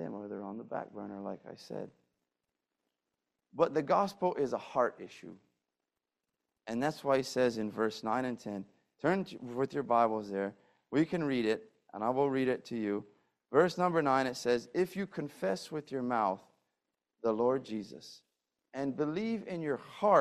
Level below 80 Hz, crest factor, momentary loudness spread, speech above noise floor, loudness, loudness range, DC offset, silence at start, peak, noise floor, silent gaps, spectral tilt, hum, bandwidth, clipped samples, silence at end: -74 dBFS; 22 dB; 15 LU; 57 dB; -34 LUFS; 5 LU; under 0.1%; 0 s; -12 dBFS; -89 dBFS; none; -6 dB/octave; none; 14 kHz; under 0.1%; 0 s